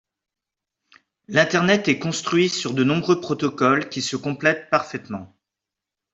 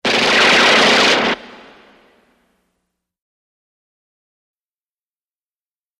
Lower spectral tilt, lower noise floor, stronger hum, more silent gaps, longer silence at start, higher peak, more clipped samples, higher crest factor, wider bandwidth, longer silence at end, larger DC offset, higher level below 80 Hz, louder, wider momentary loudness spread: first, -4.5 dB/octave vs -1.5 dB/octave; second, -86 dBFS vs under -90 dBFS; neither; neither; first, 1.3 s vs 0.05 s; about the same, -4 dBFS vs -2 dBFS; neither; about the same, 20 dB vs 18 dB; second, 8 kHz vs 15.5 kHz; second, 0.9 s vs 4.55 s; neither; second, -62 dBFS vs -56 dBFS; second, -21 LUFS vs -11 LUFS; about the same, 8 LU vs 9 LU